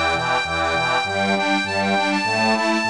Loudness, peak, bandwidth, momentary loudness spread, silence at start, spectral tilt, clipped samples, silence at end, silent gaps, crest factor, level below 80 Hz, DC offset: -19 LUFS; -8 dBFS; 10.5 kHz; 2 LU; 0 s; -4 dB/octave; under 0.1%; 0 s; none; 12 dB; -48 dBFS; 0.3%